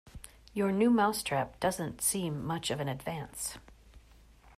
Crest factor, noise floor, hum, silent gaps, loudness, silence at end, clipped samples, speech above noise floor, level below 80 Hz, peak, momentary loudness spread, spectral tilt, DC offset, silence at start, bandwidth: 16 dB; -58 dBFS; none; none; -32 LUFS; 0.1 s; under 0.1%; 27 dB; -58 dBFS; -16 dBFS; 14 LU; -4.5 dB/octave; under 0.1%; 0.05 s; 15.5 kHz